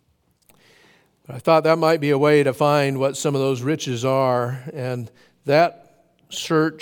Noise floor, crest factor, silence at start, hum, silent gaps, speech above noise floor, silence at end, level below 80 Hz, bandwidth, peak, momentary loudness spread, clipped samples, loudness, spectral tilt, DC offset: -62 dBFS; 18 dB; 1.3 s; none; none; 42 dB; 0 s; -70 dBFS; 18 kHz; -4 dBFS; 13 LU; under 0.1%; -20 LUFS; -5.5 dB/octave; under 0.1%